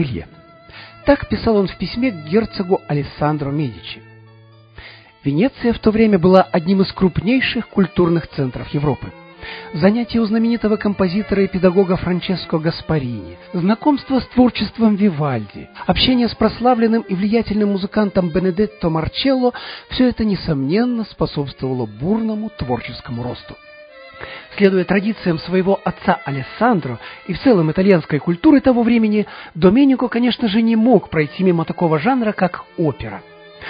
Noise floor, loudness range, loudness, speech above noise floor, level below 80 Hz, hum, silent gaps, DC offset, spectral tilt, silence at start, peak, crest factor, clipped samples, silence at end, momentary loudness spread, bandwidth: -45 dBFS; 6 LU; -17 LUFS; 29 dB; -40 dBFS; none; none; under 0.1%; -10 dB/octave; 0 s; 0 dBFS; 18 dB; under 0.1%; 0 s; 13 LU; 5.2 kHz